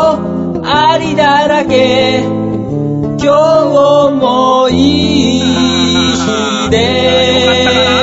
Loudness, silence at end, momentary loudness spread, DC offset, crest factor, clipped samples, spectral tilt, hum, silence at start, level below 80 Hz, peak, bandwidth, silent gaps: -10 LUFS; 0 s; 7 LU; under 0.1%; 10 dB; under 0.1%; -5 dB/octave; none; 0 s; -36 dBFS; 0 dBFS; 8 kHz; none